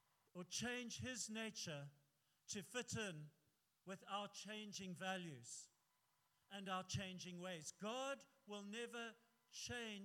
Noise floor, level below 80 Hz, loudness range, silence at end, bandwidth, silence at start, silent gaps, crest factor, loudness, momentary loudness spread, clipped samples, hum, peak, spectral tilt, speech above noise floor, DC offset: -84 dBFS; -84 dBFS; 3 LU; 0 s; 17.5 kHz; 0.35 s; none; 18 dB; -50 LUFS; 12 LU; under 0.1%; none; -34 dBFS; -3 dB/octave; 34 dB; under 0.1%